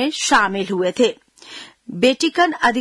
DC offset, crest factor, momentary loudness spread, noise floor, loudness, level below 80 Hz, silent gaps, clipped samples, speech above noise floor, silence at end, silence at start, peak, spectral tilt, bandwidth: under 0.1%; 14 dB; 20 LU; -39 dBFS; -17 LUFS; -54 dBFS; none; under 0.1%; 22 dB; 0 s; 0 s; -4 dBFS; -3 dB/octave; 12 kHz